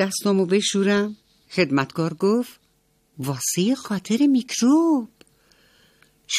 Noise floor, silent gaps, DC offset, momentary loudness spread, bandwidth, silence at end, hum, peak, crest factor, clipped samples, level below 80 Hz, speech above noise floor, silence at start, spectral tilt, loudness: -64 dBFS; none; under 0.1%; 11 LU; 15.5 kHz; 0 s; none; -6 dBFS; 18 dB; under 0.1%; -66 dBFS; 44 dB; 0 s; -4.5 dB/octave; -21 LUFS